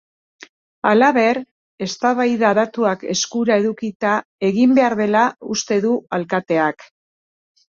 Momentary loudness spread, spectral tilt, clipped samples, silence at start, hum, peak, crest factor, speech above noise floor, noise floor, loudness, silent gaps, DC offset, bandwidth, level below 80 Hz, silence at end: 8 LU; -4.5 dB/octave; under 0.1%; 0.85 s; none; -2 dBFS; 16 dB; over 73 dB; under -90 dBFS; -18 LUFS; 1.51-1.78 s, 3.95-4.00 s, 4.25-4.39 s; under 0.1%; 7.4 kHz; -64 dBFS; 1 s